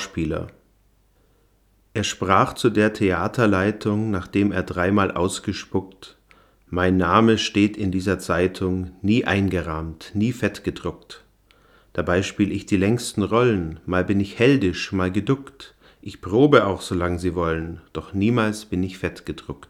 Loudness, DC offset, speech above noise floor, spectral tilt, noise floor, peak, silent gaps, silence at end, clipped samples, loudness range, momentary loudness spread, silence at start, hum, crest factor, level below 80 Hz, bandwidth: -22 LUFS; under 0.1%; 39 dB; -6 dB/octave; -60 dBFS; 0 dBFS; none; 0.05 s; under 0.1%; 4 LU; 13 LU; 0 s; none; 22 dB; -50 dBFS; 14.5 kHz